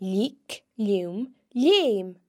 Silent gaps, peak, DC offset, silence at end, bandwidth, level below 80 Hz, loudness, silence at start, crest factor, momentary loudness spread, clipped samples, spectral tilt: none; -10 dBFS; under 0.1%; 0.15 s; 15.5 kHz; -84 dBFS; -25 LUFS; 0 s; 16 dB; 16 LU; under 0.1%; -5.5 dB/octave